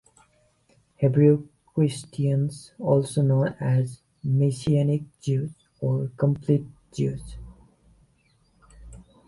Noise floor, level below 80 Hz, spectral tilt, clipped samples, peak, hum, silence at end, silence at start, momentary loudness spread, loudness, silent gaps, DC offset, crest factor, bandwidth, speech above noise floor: -64 dBFS; -52 dBFS; -8 dB/octave; under 0.1%; -6 dBFS; none; 0.25 s; 1 s; 12 LU; -25 LUFS; none; under 0.1%; 18 dB; 11.5 kHz; 41 dB